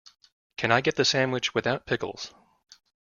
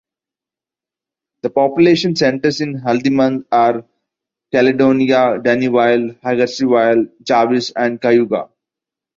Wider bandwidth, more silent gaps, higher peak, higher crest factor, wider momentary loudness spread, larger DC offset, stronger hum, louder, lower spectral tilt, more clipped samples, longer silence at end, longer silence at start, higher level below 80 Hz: about the same, 7.4 kHz vs 7.6 kHz; neither; second, -4 dBFS vs 0 dBFS; first, 24 dB vs 14 dB; first, 16 LU vs 7 LU; neither; neither; second, -25 LUFS vs -15 LUFS; second, -3.5 dB/octave vs -6 dB/octave; neither; first, 0.9 s vs 0.75 s; second, 0.6 s vs 1.45 s; about the same, -62 dBFS vs -58 dBFS